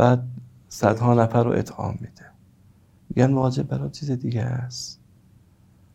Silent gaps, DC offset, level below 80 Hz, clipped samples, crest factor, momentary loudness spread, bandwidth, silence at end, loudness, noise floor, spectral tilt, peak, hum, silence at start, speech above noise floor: none; under 0.1%; -54 dBFS; under 0.1%; 22 dB; 17 LU; 12.5 kHz; 1 s; -23 LUFS; -55 dBFS; -7 dB/octave; -2 dBFS; none; 0 s; 33 dB